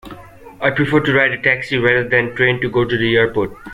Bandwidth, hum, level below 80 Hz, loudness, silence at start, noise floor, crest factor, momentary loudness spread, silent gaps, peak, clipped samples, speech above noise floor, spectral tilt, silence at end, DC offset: 13 kHz; none; -44 dBFS; -15 LUFS; 0.05 s; -37 dBFS; 16 dB; 4 LU; none; -2 dBFS; under 0.1%; 21 dB; -7 dB/octave; 0 s; under 0.1%